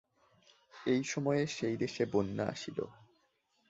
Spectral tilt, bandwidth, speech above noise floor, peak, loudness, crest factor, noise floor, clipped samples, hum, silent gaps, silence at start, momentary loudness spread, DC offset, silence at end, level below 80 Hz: -5.5 dB/octave; 8 kHz; 41 dB; -18 dBFS; -35 LUFS; 20 dB; -76 dBFS; under 0.1%; none; none; 0.75 s; 9 LU; under 0.1%; 0.75 s; -68 dBFS